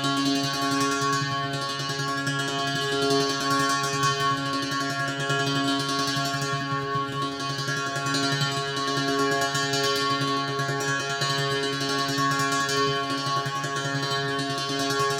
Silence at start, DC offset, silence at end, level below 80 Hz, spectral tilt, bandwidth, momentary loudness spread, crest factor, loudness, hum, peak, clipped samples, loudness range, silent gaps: 0 s; under 0.1%; 0 s; -62 dBFS; -3.5 dB/octave; 17.5 kHz; 4 LU; 14 dB; -25 LUFS; none; -12 dBFS; under 0.1%; 2 LU; none